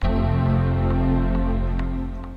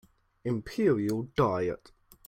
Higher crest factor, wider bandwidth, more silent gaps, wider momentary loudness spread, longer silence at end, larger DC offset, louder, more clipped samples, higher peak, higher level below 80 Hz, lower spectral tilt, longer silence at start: second, 10 dB vs 18 dB; second, 5 kHz vs 16 kHz; neither; second, 6 LU vs 10 LU; second, 0 s vs 0.5 s; neither; first, -23 LUFS vs -30 LUFS; neither; first, -10 dBFS vs -14 dBFS; first, -24 dBFS vs -58 dBFS; first, -10 dB/octave vs -7.5 dB/octave; second, 0 s vs 0.45 s